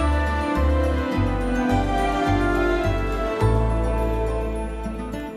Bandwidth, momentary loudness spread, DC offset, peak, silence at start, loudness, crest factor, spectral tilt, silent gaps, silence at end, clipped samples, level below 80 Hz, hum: 14 kHz; 7 LU; under 0.1%; -8 dBFS; 0 s; -23 LUFS; 12 dB; -7 dB/octave; none; 0 s; under 0.1%; -26 dBFS; none